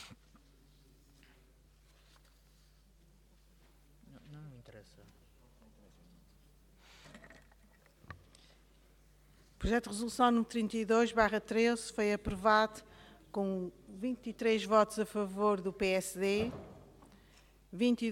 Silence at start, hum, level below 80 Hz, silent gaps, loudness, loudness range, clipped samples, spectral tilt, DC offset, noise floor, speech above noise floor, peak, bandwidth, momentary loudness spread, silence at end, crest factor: 0 s; none; -56 dBFS; none; -33 LUFS; 5 LU; under 0.1%; -5 dB/octave; under 0.1%; -64 dBFS; 32 dB; -14 dBFS; 16 kHz; 25 LU; 0 s; 24 dB